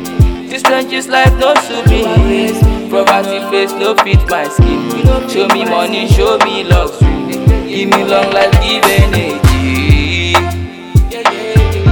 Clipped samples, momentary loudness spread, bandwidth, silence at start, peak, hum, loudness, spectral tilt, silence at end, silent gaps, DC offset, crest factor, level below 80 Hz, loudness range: 0.2%; 4 LU; 19.5 kHz; 0 s; 0 dBFS; none; -11 LUFS; -5.5 dB/octave; 0 s; none; under 0.1%; 10 dB; -16 dBFS; 1 LU